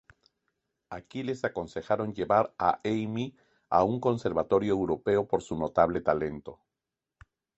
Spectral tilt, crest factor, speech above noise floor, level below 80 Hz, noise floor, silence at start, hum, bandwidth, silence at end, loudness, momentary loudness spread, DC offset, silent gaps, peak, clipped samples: -7 dB/octave; 22 dB; 60 dB; -56 dBFS; -88 dBFS; 0.9 s; none; 8.2 kHz; 1.05 s; -29 LUFS; 12 LU; under 0.1%; none; -8 dBFS; under 0.1%